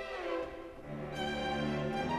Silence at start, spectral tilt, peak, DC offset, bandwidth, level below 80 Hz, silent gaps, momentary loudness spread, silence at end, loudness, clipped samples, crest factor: 0 s; -6 dB/octave; -24 dBFS; under 0.1%; 13.5 kHz; -54 dBFS; none; 9 LU; 0 s; -38 LUFS; under 0.1%; 14 dB